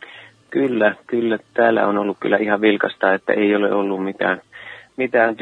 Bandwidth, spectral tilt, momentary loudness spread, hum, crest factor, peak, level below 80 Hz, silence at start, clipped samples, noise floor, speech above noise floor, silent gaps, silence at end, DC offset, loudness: 4.3 kHz; -7.5 dB/octave; 10 LU; none; 18 dB; 0 dBFS; -68 dBFS; 0 s; under 0.1%; -42 dBFS; 24 dB; none; 0.05 s; under 0.1%; -19 LUFS